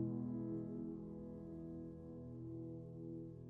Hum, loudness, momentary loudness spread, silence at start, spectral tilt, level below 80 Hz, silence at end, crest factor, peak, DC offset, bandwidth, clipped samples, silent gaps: none; -49 LUFS; 7 LU; 0 s; -13 dB/octave; -68 dBFS; 0 s; 16 dB; -30 dBFS; under 0.1%; 2.1 kHz; under 0.1%; none